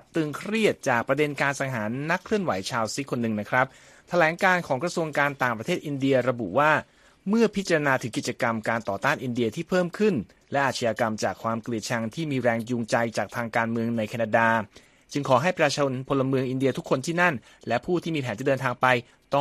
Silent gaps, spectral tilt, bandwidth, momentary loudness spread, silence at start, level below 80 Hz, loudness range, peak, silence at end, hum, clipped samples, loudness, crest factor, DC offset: none; -5.5 dB/octave; 14.5 kHz; 7 LU; 0.15 s; -62 dBFS; 2 LU; -4 dBFS; 0 s; none; under 0.1%; -25 LUFS; 20 dB; under 0.1%